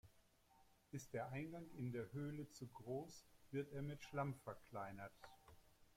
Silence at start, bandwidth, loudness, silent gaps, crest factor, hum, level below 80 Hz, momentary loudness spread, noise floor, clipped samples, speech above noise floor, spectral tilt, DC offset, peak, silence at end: 0.05 s; 16.5 kHz; -51 LUFS; none; 18 dB; none; -76 dBFS; 11 LU; -74 dBFS; under 0.1%; 24 dB; -6.5 dB/octave; under 0.1%; -34 dBFS; 0 s